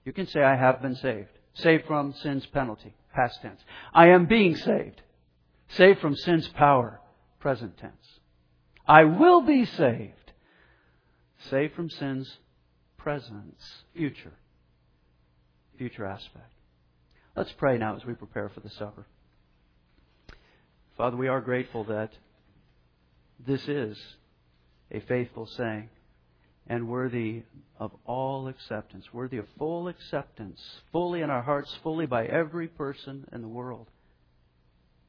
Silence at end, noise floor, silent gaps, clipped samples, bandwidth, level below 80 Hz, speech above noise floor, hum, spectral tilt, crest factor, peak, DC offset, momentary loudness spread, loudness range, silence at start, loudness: 1.25 s; -66 dBFS; none; under 0.1%; 5.4 kHz; -58 dBFS; 40 dB; none; -8.5 dB/octave; 28 dB; 0 dBFS; under 0.1%; 23 LU; 15 LU; 0.05 s; -25 LUFS